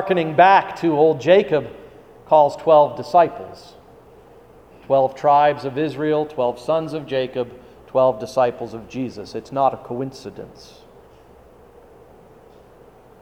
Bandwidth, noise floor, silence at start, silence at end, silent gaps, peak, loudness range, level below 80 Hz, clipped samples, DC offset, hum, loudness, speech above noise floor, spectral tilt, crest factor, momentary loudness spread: 11 kHz; -47 dBFS; 0 s; 2.75 s; none; 0 dBFS; 11 LU; -56 dBFS; under 0.1%; under 0.1%; none; -18 LUFS; 29 dB; -6.5 dB/octave; 20 dB; 17 LU